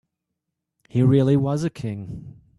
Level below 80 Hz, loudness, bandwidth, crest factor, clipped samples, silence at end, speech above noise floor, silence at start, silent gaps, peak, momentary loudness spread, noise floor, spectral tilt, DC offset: -54 dBFS; -21 LUFS; 11 kHz; 16 dB; under 0.1%; 0.25 s; 61 dB; 0.95 s; none; -6 dBFS; 18 LU; -81 dBFS; -8.5 dB/octave; under 0.1%